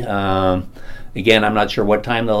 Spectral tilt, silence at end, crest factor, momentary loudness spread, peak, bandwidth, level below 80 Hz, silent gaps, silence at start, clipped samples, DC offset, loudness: -6 dB/octave; 0 s; 18 dB; 11 LU; 0 dBFS; 16 kHz; -36 dBFS; none; 0 s; under 0.1%; under 0.1%; -17 LUFS